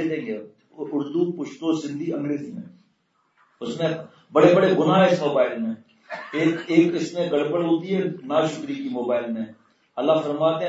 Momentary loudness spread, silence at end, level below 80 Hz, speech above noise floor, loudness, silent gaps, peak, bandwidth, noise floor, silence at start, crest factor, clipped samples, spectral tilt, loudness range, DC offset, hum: 17 LU; 0 s; -72 dBFS; 45 dB; -23 LUFS; none; -4 dBFS; 8 kHz; -68 dBFS; 0 s; 20 dB; under 0.1%; -6.5 dB/octave; 8 LU; under 0.1%; none